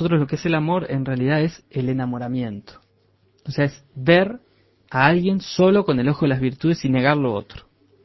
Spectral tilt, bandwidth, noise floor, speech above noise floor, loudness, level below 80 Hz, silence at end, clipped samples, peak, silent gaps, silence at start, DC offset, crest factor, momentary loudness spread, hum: -7.5 dB/octave; 6.2 kHz; -61 dBFS; 41 dB; -20 LUFS; -52 dBFS; 0.45 s; under 0.1%; 0 dBFS; none; 0 s; under 0.1%; 20 dB; 11 LU; none